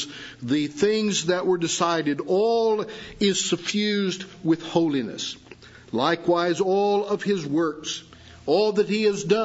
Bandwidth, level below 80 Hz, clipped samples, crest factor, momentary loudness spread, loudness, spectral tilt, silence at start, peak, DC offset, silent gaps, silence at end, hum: 8 kHz; -62 dBFS; under 0.1%; 16 dB; 10 LU; -23 LUFS; -4 dB/octave; 0 s; -6 dBFS; under 0.1%; none; 0 s; none